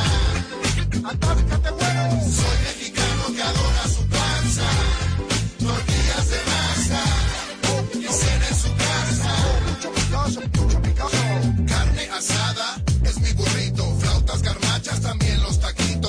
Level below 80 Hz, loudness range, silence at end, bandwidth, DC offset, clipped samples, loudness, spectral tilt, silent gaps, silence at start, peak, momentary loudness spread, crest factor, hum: -24 dBFS; 1 LU; 0 s; 10.5 kHz; under 0.1%; under 0.1%; -21 LUFS; -4 dB/octave; none; 0 s; -10 dBFS; 3 LU; 10 dB; none